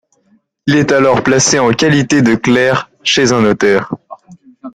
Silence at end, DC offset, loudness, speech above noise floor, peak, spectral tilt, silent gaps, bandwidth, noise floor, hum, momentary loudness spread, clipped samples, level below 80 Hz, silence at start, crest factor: 0.05 s; under 0.1%; -11 LUFS; 45 dB; 0 dBFS; -4 dB/octave; none; 12 kHz; -55 dBFS; none; 6 LU; under 0.1%; -46 dBFS; 0.65 s; 12 dB